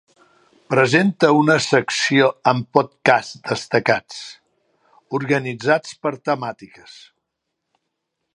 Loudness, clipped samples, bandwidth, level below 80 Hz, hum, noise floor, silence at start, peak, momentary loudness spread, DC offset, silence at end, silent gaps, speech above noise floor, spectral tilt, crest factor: -18 LUFS; under 0.1%; 11 kHz; -64 dBFS; none; -78 dBFS; 0.7 s; 0 dBFS; 12 LU; under 0.1%; 1.7 s; none; 59 dB; -5 dB/octave; 20 dB